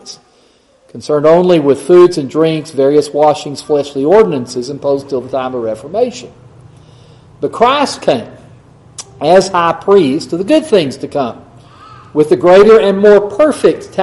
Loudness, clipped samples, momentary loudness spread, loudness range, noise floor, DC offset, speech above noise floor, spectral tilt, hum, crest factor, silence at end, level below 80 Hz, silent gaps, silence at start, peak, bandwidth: -11 LUFS; 0.2%; 12 LU; 7 LU; -49 dBFS; under 0.1%; 39 dB; -5.5 dB/octave; none; 12 dB; 0 s; -48 dBFS; none; 0.05 s; 0 dBFS; 12 kHz